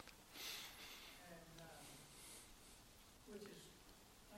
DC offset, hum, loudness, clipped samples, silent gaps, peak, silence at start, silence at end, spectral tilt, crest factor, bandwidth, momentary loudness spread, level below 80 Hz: under 0.1%; none; -57 LUFS; under 0.1%; none; -38 dBFS; 0 s; 0 s; -2 dB/octave; 22 dB; 16 kHz; 13 LU; -72 dBFS